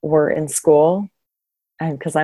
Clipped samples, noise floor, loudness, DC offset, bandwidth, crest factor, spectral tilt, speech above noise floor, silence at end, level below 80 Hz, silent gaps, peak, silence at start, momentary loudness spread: under 0.1%; -82 dBFS; -17 LUFS; under 0.1%; 13 kHz; 16 dB; -5.5 dB/octave; 66 dB; 0 s; -58 dBFS; none; -2 dBFS; 0.05 s; 13 LU